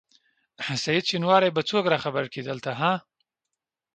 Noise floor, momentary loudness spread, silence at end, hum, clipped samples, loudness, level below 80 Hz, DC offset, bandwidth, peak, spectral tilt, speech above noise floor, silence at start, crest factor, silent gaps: -85 dBFS; 11 LU; 0.95 s; none; under 0.1%; -25 LUFS; -68 dBFS; under 0.1%; 9.2 kHz; -6 dBFS; -4.5 dB/octave; 61 dB; 0.6 s; 22 dB; none